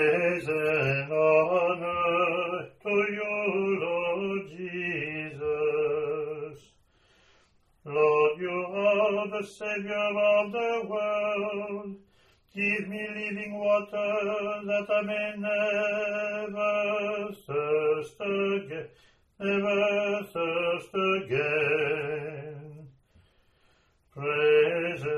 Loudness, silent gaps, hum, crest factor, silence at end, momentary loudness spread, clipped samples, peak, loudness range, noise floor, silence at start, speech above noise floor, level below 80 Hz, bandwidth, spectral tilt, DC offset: -28 LUFS; none; none; 18 dB; 0 s; 10 LU; under 0.1%; -10 dBFS; 4 LU; -65 dBFS; 0 s; 39 dB; -68 dBFS; 12 kHz; -6 dB/octave; under 0.1%